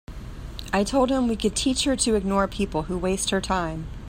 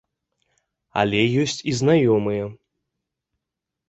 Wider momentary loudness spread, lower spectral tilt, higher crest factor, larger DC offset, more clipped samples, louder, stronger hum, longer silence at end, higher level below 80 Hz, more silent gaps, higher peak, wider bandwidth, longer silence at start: about the same, 12 LU vs 11 LU; second, -4 dB/octave vs -5.5 dB/octave; about the same, 16 dB vs 20 dB; neither; neither; second, -24 LUFS vs -20 LUFS; neither; second, 0 s vs 1.35 s; first, -38 dBFS vs -56 dBFS; neither; second, -8 dBFS vs -4 dBFS; first, 16 kHz vs 8.2 kHz; second, 0.1 s vs 0.95 s